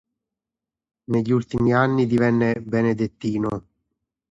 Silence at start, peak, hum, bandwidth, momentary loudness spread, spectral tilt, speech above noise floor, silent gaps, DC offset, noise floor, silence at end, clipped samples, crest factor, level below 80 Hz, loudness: 1.1 s; -6 dBFS; none; 7.8 kHz; 7 LU; -8.5 dB/octave; 68 dB; none; under 0.1%; -88 dBFS; 0.7 s; under 0.1%; 16 dB; -52 dBFS; -21 LUFS